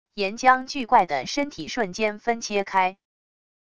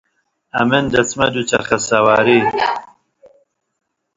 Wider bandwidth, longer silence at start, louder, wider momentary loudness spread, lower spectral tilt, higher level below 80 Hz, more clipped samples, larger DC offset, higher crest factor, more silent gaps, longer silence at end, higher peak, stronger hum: first, 10.5 kHz vs 7.8 kHz; second, 0.05 s vs 0.55 s; second, -23 LUFS vs -15 LUFS; about the same, 8 LU vs 7 LU; about the same, -3 dB/octave vs -4 dB/octave; second, -58 dBFS vs -48 dBFS; neither; first, 0.5% vs under 0.1%; about the same, 20 dB vs 18 dB; neither; second, 0.65 s vs 1.3 s; second, -4 dBFS vs 0 dBFS; neither